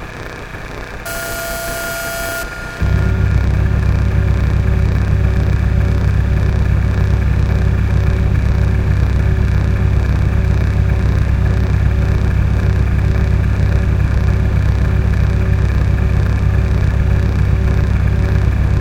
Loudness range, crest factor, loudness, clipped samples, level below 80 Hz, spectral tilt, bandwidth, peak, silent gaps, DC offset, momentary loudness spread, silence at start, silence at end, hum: 2 LU; 12 dB; -15 LUFS; under 0.1%; -16 dBFS; -7 dB/octave; 17 kHz; 0 dBFS; none; under 0.1%; 6 LU; 0 s; 0 s; none